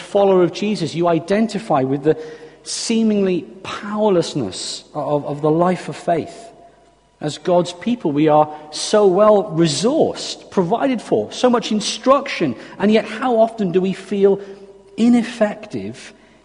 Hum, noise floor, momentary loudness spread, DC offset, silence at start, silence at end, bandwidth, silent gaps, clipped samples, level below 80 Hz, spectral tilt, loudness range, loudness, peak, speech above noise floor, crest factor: none; -52 dBFS; 12 LU; under 0.1%; 0 s; 0.35 s; 10.5 kHz; none; under 0.1%; -58 dBFS; -5.5 dB/octave; 4 LU; -18 LUFS; -2 dBFS; 35 dB; 16 dB